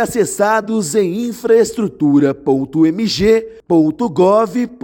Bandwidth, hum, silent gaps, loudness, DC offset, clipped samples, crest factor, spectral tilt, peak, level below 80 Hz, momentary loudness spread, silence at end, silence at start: 17 kHz; none; none; -14 LUFS; under 0.1%; under 0.1%; 12 dB; -5.5 dB/octave; -2 dBFS; -46 dBFS; 5 LU; 0.1 s; 0 s